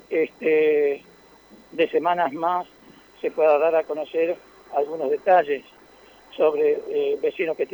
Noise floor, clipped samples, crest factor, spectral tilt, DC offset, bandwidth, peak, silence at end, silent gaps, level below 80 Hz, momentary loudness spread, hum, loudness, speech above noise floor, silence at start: -51 dBFS; under 0.1%; 18 dB; -6 dB/octave; under 0.1%; over 20 kHz; -6 dBFS; 0.1 s; none; -68 dBFS; 11 LU; none; -22 LUFS; 29 dB; 0.1 s